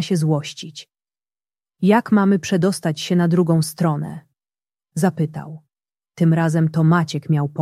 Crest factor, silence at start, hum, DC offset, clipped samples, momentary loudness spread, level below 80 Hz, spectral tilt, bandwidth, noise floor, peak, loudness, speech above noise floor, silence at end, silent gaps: 16 dB; 0 s; none; under 0.1%; under 0.1%; 16 LU; -62 dBFS; -6.5 dB/octave; 14.5 kHz; under -90 dBFS; -2 dBFS; -19 LUFS; over 72 dB; 0 s; none